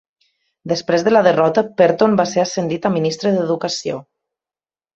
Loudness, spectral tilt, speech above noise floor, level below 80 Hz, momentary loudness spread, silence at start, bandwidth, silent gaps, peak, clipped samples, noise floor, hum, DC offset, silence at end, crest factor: -17 LUFS; -5.5 dB/octave; over 74 dB; -60 dBFS; 10 LU; 0.65 s; 8 kHz; none; 0 dBFS; under 0.1%; under -90 dBFS; none; under 0.1%; 0.95 s; 18 dB